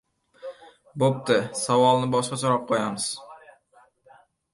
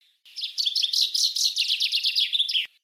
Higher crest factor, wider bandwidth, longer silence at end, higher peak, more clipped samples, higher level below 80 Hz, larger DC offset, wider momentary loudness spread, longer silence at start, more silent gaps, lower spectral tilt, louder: about the same, 18 dB vs 16 dB; second, 11.5 kHz vs 16 kHz; first, 1.15 s vs 0.15 s; first, -6 dBFS vs -10 dBFS; neither; first, -68 dBFS vs under -90 dBFS; neither; first, 22 LU vs 8 LU; first, 0.45 s vs 0.25 s; neither; first, -4.5 dB/octave vs 8.5 dB/octave; about the same, -23 LUFS vs -22 LUFS